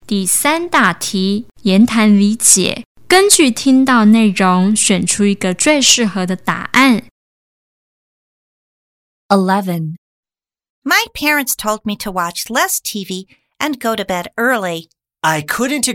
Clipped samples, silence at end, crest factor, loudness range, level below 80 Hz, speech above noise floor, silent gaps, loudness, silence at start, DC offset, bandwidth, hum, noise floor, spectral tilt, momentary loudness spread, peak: under 0.1%; 0 s; 14 dB; 8 LU; -50 dBFS; over 76 dB; 2.86-2.95 s, 7.11-9.29 s, 9.98-10.23 s, 10.70-10.82 s; -13 LUFS; 0.1 s; under 0.1%; 17 kHz; none; under -90 dBFS; -3 dB/octave; 12 LU; 0 dBFS